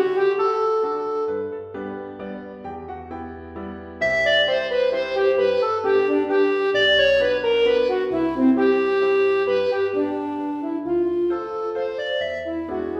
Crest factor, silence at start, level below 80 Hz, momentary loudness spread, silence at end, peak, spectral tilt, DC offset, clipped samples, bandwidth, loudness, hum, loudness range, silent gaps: 14 dB; 0 s; -52 dBFS; 16 LU; 0 s; -6 dBFS; -5 dB/octave; under 0.1%; under 0.1%; 7.4 kHz; -21 LUFS; none; 7 LU; none